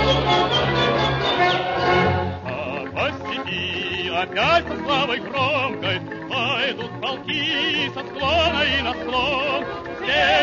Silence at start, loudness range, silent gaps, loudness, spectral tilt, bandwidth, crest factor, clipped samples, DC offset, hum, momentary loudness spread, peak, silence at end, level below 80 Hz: 0 s; 2 LU; none; -21 LUFS; -5 dB/octave; 7.4 kHz; 16 dB; under 0.1%; under 0.1%; none; 9 LU; -6 dBFS; 0 s; -44 dBFS